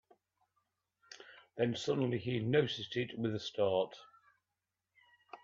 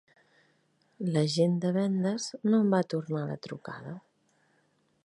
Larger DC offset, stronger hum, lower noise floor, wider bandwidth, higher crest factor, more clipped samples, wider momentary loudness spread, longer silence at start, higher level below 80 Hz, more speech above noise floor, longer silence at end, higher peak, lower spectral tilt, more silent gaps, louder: neither; neither; first, -89 dBFS vs -71 dBFS; second, 7.8 kHz vs 11.5 kHz; about the same, 20 dB vs 18 dB; neither; first, 22 LU vs 16 LU; about the same, 1.1 s vs 1 s; about the same, -76 dBFS vs -76 dBFS; first, 54 dB vs 42 dB; second, 0.05 s vs 1.05 s; second, -18 dBFS vs -12 dBFS; about the same, -6 dB/octave vs -6.5 dB/octave; neither; second, -35 LUFS vs -29 LUFS